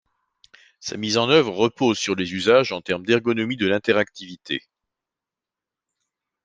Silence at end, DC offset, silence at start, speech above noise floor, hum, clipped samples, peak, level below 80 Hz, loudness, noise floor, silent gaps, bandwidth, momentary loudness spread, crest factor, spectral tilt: 1.85 s; under 0.1%; 0.85 s; 67 dB; none; under 0.1%; -2 dBFS; -66 dBFS; -21 LUFS; -88 dBFS; none; 9.6 kHz; 12 LU; 22 dB; -4.5 dB/octave